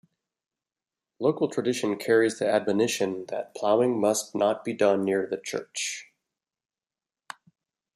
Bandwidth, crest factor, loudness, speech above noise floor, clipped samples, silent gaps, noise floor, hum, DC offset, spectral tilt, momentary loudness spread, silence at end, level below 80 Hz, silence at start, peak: 14.5 kHz; 18 dB; -26 LUFS; over 65 dB; under 0.1%; none; under -90 dBFS; none; under 0.1%; -4 dB/octave; 11 LU; 1.95 s; -76 dBFS; 1.2 s; -8 dBFS